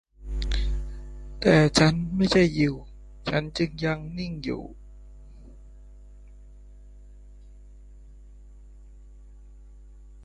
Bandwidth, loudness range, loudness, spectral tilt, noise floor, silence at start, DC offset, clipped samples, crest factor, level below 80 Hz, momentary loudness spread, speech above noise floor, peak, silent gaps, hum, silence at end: 11.5 kHz; 16 LU; -25 LUFS; -5.5 dB/octave; -47 dBFS; 0.2 s; under 0.1%; under 0.1%; 24 dB; -38 dBFS; 19 LU; 24 dB; -4 dBFS; none; 50 Hz at -45 dBFS; 0 s